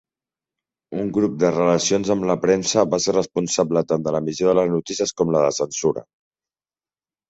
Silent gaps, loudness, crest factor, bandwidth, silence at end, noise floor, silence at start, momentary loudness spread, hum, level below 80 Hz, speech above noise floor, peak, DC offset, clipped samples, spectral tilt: none; -20 LUFS; 18 dB; 8.2 kHz; 1.25 s; under -90 dBFS; 0.9 s; 6 LU; none; -56 dBFS; over 70 dB; -2 dBFS; under 0.1%; under 0.1%; -4.5 dB/octave